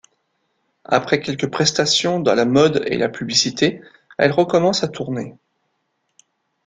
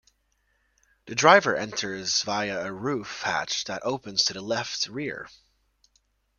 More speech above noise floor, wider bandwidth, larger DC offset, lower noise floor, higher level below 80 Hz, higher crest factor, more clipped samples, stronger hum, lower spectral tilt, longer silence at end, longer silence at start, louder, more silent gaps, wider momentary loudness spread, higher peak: first, 53 dB vs 45 dB; about the same, 9.6 kHz vs 10 kHz; neither; about the same, -71 dBFS vs -71 dBFS; first, -58 dBFS vs -66 dBFS; second, 18 dB vs 26 dB; neither; neither; first, -4 dB/octave vs -2.5 dB/octave; first, 1.35 s vs 1.1 s; second, 0.9 s vs 1.05 s; first, -18 LUFS vs -25 LUFS; neither; second, 11 LU vs 14 LU; about the same, -2 dBFS vs -2 dBFS